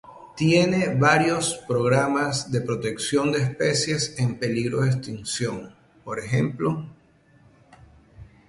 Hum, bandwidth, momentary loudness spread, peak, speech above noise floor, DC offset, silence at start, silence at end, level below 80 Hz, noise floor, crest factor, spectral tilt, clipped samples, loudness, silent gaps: none; 11.5 kHz; 12 LU; -4 dBFS; 33 dB; under 0.1%; 0.05 s; 0.25 s; -56 dBFS; -56 dBFS; 20 dB; -5 dB/octave; under 0.1%; -23 LUFS; none